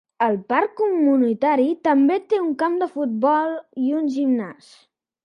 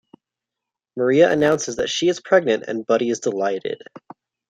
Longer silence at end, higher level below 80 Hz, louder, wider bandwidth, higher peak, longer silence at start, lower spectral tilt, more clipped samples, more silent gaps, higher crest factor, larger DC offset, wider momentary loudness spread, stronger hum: first, 0.7 s vs 0.5 s; second, -74 dBFS vs -60 dBFS; about the same, -20 LUFS vs -19 LUFS; about the same, 9.8 kHz vs 10 kHz; about the same, -4 dBFS vs -2 dBFS; second, 0.2 s vs 0.95 s; first, -7 dB/octave vs -4 dB/octave; neither; neither; about the same, 16 dB vs 18 dB; neither; second, 6 LU vs 11 LU; neither